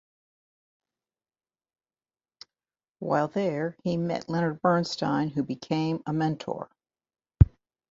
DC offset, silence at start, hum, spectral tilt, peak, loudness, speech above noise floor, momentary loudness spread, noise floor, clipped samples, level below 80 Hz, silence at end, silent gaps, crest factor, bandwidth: under 0.1%; 3 s; none; -7.5 dB/octave; -2 dBFS; -27 LUFS; over 62 dB; 11 LU; under -90 dBFS; under 0.1%; -38 dBFS; 0.45 s; none; 28 dB; 7.8 kHz